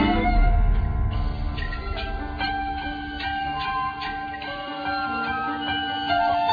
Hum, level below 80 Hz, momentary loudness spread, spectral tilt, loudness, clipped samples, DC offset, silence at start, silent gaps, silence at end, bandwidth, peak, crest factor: none; -28 dBFS; 9 LU; -7.5 dB/octave; -26 LUFS; under 0.1%; under 0.1%; 0 s; none; 0 s; 5 kHz; -8 dBFS; 16 dB